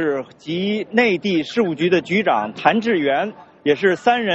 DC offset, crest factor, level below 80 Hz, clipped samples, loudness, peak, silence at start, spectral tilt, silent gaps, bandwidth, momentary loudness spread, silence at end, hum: under 0.1%; 18 dB; -62 dBFS; under 0.1%; -19 LUFS; -2 dBFS; 0 s; -3.5 dB/octave; none; 8 kHz; 7 LU; 0 s; none